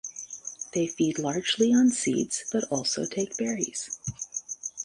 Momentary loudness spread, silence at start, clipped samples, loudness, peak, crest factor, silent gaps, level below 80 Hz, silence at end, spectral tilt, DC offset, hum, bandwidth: 13 LU; 0.05 s; under 0.1%; -27 LUFS; -10 dBFS; 18 dB; none; -64 dBFS; 0 s; -3.5 dB/octave; under 0.1%; none; 11.5 kHz